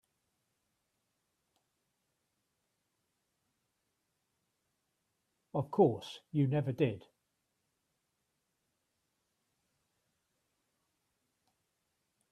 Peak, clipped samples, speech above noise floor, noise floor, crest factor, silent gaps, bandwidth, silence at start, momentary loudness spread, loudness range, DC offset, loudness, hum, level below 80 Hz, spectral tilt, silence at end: -14 dBFS; under 0.1%; 51 dB; -83 dBFS; 26 dB; none; 12 kHz; 5.55 s; 12 LU; 8 LU; under 0.1%; -33 LUFS; none; -80 dBFS; -8.5 dB/octave; 5.3 s